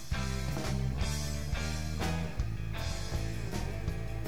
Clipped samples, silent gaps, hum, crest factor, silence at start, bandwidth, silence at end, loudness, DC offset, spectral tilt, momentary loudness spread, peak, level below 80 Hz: under 0.1%; none; none; 14 dB; 0 s; 19 kHz; 0 s; -36 LUFS; 0.9%; -5 dB/octave; 3 LU; -20 dBFS; -38 dBFS